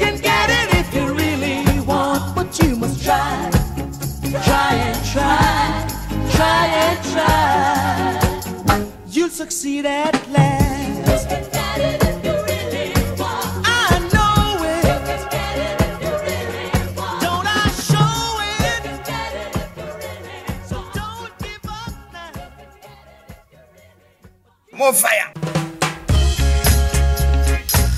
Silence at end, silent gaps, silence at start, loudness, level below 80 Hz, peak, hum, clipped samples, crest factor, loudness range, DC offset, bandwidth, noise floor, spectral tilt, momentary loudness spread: 0 s; none; 0 s; -18 LUFS; -26 dBFS; 0 dBFS; none; under 0.1%; 18 dB; 12 LU; under 0.1%; 16 kHz; -50 dBFS; -4.5 dB/octave; 13 LU